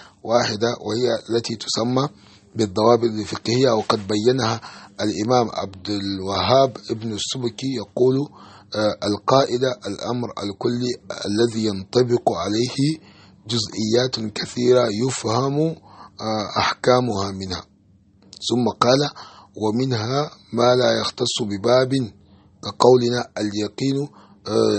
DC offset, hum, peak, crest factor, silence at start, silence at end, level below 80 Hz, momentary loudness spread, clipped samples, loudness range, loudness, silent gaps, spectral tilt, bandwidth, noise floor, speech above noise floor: under 0.1%; none; 0 dBFS; 20 dB; 0 s; 0 s; -58 dBFS; 11 LU; under 0.1%; 2 LU; -21 LUFS; none; -5 dB/octave; 8.8 kHz; -55 dBFS; 34 dB